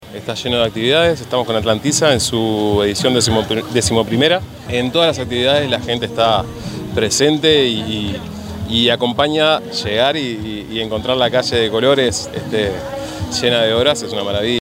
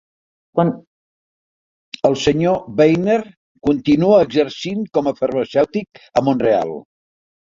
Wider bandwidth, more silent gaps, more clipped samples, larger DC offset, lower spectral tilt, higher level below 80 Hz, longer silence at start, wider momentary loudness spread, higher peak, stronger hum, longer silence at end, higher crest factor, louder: first, 16 kHz vs 7.6 kHz; second, none vs 0.87-1.92 s, 3.37-3.55 s; neither; neither; second, -4 dB/octave vs -6.5 dB/octave; first, -42 dBFS vs -50 dBFS; second, 0 s vs 0.55 s; about the same, 9 LU vs 10 LU; about the same, 0 dBFS vs -2 dBFS; neither; second, 0 s vs 0.75 s; about the same, 16 dB vs 18 dB; about the same, -16 LUFS vs -17 LUFS